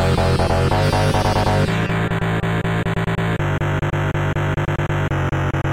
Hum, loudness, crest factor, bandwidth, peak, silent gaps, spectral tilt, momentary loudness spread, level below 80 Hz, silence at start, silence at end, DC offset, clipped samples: none; -19 LUFS; 12 dB; 16 kHz; -6 dBFS; none; -6.5 dB/octave; 4 LU; -30 dBFS; 0 s; 0 s; 0.5%; under 0.1%